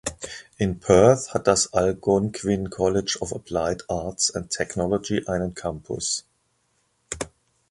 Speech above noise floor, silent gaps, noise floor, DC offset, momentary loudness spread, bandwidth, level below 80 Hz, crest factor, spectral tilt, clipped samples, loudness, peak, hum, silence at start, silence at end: 46 dB; none; -69 dBFS; under 0.1%; 14 LU; 11.5 kHz; -46 dBFS; 22 dB; -4.5 dB/octave; under 0.1%; -23 LUFS; -2 dBFS; none; 0.05 s; 0.45 s